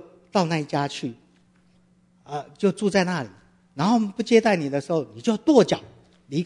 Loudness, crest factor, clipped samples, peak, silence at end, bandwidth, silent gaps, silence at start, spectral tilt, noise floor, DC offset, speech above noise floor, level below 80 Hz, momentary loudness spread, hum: -23 LUFS; 22 dB; under 0.1%; -2 dBFS; 0 s; 11 kHz; none; 0.35 s; -6 dB/octave; -60 dBFS; under 0.1%; 38 dB; -66 dBFS; 16 LU; none